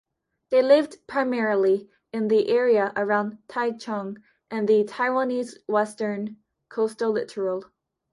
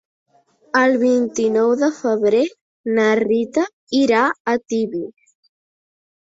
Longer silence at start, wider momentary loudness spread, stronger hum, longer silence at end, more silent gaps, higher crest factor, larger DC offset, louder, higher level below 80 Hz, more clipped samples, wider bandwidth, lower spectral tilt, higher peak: second, 0.5 s vs 0.75 s; first, 12 LU vs 8 LU; neither; second, 0.5 s vs 1.1 s; second, none vs 2.61-2.84 s, 3.73-3.87 s, 4.40-4.45 s; about the same, 18 dB vs 16 dB; neither; second, -24 LUFS vs -18 LUFS; second, -74 dBFS vs -64 dBFS; neither; first, 11.5 kHz vs 7.8 kHz; first, -6 dB/octave vs -4.5 dB/octave; second, -6 dBFS vs -2 dBFS